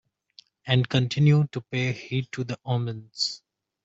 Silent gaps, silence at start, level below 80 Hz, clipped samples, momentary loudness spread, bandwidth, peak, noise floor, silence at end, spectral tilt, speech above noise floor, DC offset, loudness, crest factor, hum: none; 0.65 s; -60 dBFS; under 0.1%; 12 LU; 8 kHz; -8 dBFS; -57 dBFS; 0.5 s; -6 dB/octave; 32 dB; under 0.1%; -26 LUFS; 18 dB; none